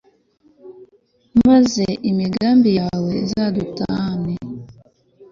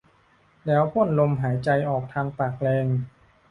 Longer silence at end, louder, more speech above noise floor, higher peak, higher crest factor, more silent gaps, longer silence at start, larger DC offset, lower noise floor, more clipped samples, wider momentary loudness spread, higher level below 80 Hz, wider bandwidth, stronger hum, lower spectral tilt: second, 0.1 s vs 0.4 s; first, -18 LUFS vs -24 LUFS; first, 43 dB vs 37 dB; first, -4 dBFS vs -8 dBFS; about the same, 16 dB vs 16 dB; neither; about the same, 0.65 s vs 0.65 s; neither; about the same, -57 dBFS vs -60 dBFS; neither; first, 12 LU vs 8 LU; first, -48 dBFS vs -56 dBFS; second, 7.4 kHz vs 9.6 kHz; neither; second, -6.5 dB/octave vs -9.5 dB/octave